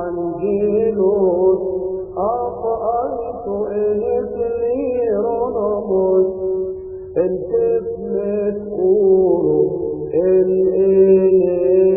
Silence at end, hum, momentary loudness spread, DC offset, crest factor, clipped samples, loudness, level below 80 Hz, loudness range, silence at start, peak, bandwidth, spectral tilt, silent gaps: 0 s; none; 10 LU; under 0.1%; 14 dB; under 0.1%; -17 LUFS; -46 dBFS; 5 LU; 0 s; -4 dBFS; 2.8 kHz; -15.5 dB/octave; none